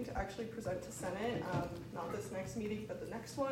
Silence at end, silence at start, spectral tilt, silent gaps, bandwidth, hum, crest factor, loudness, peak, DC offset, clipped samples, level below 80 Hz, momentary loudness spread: 0 s; 0 s; -5.5 dB/octave; none; 16 kHz; none; 16 dB; -42 LUFS; -24 dBFS; under 0.1%; under 0.1%; -58 dBFS; 6 LU